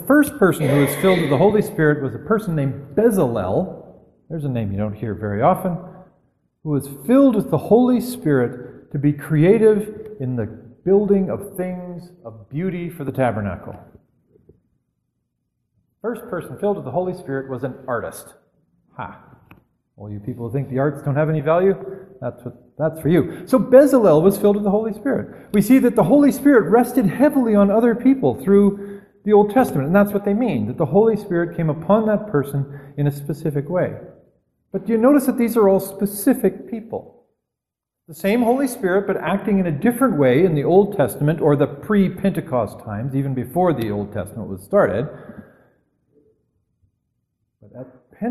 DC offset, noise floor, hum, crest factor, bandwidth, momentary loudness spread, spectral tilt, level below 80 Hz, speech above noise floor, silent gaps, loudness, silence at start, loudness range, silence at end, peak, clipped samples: under 0.1%; -84 dBFS; none; 18 dB; 13 kHz; 16 LU; -7.5 dB/octave; -52 dBFS; 66 dB; none; -18 LUFS; 0 s; 12 LU; 0 s; 0 dBFS; under 0.1%